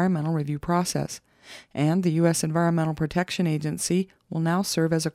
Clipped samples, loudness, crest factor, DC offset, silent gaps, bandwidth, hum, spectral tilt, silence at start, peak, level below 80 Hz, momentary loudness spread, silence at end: under 0.1%; -25 LUFS; 16 dB; under 0.1%; none; 15.5 kHz; none; -5.5 dB/octave; 0 s; -8 dBFS; -54 dBFS; 10 LU; 0.05 s